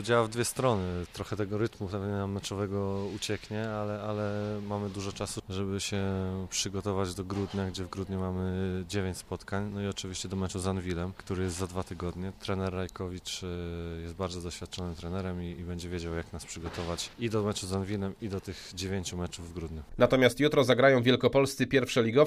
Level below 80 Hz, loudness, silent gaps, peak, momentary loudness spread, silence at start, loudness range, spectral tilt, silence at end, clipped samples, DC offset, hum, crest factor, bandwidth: -52 dBFS; -32 LUFS; none; -8 dBFS; 13 LU; 0 s; 9 LU; -5 dB/octave; 0 s; under 0.1%; under 0.1%; none; 22 dB; 15.5 kHz